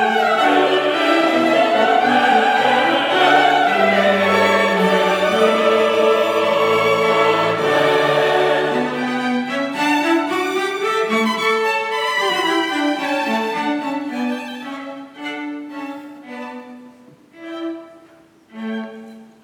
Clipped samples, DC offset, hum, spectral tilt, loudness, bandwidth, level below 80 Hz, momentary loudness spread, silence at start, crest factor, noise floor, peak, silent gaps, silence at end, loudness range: under 0.1%; under 0.1%; none; -4 dB/octave; -16 LUFS; 20 kHz; -76 dBFS; 15 LU; 0 s; 16 dB; -48 dBFS; -2 dBFS; none; 0.2 s; 17 LU